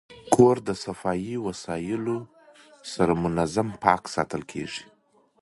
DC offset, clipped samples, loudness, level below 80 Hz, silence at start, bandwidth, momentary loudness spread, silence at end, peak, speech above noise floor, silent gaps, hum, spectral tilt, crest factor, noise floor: under 0.1%; under 0.1%; -25 LUFS; -54 dBFS; 0.1 s; 11.5 kHz; 14 LU; 0.6 s; -2 dBFS; 28 dB; none; none; -6 dB/octave; 24 dB; -53 dBFS